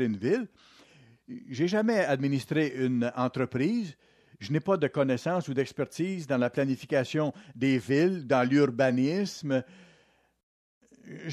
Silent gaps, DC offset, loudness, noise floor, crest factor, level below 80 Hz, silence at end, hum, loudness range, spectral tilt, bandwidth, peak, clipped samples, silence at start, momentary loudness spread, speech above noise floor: 10.43-10.81 s; under 0.1%; -28 LUFS; -65 dBFS; 16 dB; -72 dBFS; 0 s; none; 3 LU; -6.5 dB/octave; 13 kHz; -12 dBFS; under 0.1%; 0 s; 8 LU; 37 dB